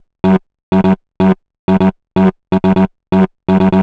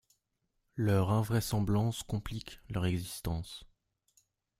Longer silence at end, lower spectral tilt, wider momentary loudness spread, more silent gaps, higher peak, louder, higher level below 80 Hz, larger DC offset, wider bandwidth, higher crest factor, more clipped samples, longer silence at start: second, 0 s vs 0.95 s; first, -9.5 dB/octave vs -6 dB/octave; second, 3 LU vs 14 LU; first, 0.63-0.72 s, 1.59-1.68 s vs none; first, 0 dBFS vs -16 dBFS; first, -14 LUFS vs -33 LUFS; first, -42 dBFS vs -52 dBFS; neither; second, 4.8 kHz vs 16 kHz; second, 12 dB vs 20 dB; neither; second, 0.25 s vs 0.75 s